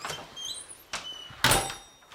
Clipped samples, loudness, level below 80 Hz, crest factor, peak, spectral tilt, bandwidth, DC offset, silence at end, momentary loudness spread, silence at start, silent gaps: under 0.1%; -29 LUFS; -50 dBFS; 22 dB; -10 dBFS; -2 dB/octave; 17.5 kHz; under 0.1%; 0 s; 16 LU; 0 s; none